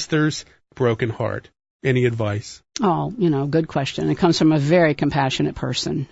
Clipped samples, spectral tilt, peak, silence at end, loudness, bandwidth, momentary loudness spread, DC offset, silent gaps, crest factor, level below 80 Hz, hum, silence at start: under 0.1%; -6 dB/octave; -4 dBFS; 0.05 s; -20 LUFS; 8 kHz; 10 LU; under 0.1%; 1.70-1.79 s; 16 dB; -48 dBFS; none; 0 s